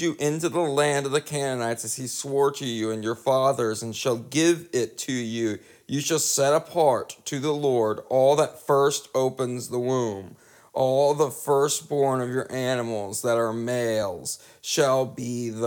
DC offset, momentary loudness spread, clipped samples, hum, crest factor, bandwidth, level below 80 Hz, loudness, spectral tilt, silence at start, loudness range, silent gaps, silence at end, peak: under 0.1%; 8 LU; under 0.1%; none; 18 dB; 19 kHz; -72 dBFS; -25 LUFS; -4 dB/octave; 0 s; 3 LU; none; 0 s; -8 dBFS